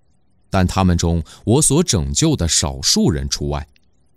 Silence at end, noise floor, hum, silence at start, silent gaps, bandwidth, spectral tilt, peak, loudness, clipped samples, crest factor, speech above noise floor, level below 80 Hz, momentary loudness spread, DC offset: 0.55 s; -61 dBFS; none; 0.55 s; none; 15.5 kHz; -4 dB/octave; -2 dBFS; -17 LUFS; under 0.1%; 14 dB; 44 dB; -30 dBFS; 9 LU; 0.2%